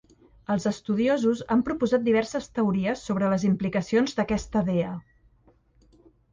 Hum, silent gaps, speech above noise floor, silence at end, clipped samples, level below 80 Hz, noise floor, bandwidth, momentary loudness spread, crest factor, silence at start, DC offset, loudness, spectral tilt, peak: none; none; 36 dB; 1.3 s; under 0.1%; -52 dBFS; -61 dBFS; 9.6 kHz; 6 LU; 14 dB; 0.5 s; under 0.1%; -25 LUFS; -6.5 dB/octave; -12 dBFS